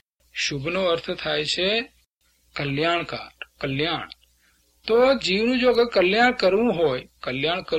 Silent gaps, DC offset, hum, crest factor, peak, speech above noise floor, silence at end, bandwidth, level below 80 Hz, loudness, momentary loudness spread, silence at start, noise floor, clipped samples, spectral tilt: 2.06-2.17 s; under 0.1%; 60 Hz at -55 dBFS; 16 dB; -6 dBFS; 43 dB; 0 s; 11 kHz; -54 dBFS; -22 LUFS; 15 LU; 0.35 s; -65 dBFS; under 0.1%; -4.5 dB/octave